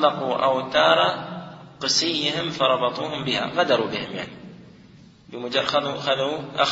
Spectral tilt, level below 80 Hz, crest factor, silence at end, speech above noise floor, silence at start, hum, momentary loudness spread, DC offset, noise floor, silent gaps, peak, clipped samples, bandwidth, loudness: -3 dB/octave; -62 dBFS; 20 dB; 0 s; 26 dB; 0 s; none; 16 LU; under 0.1%; -49 dBFS; none; -4 dBFS; under 0.1%; 7.8 kHz; -22 LUFS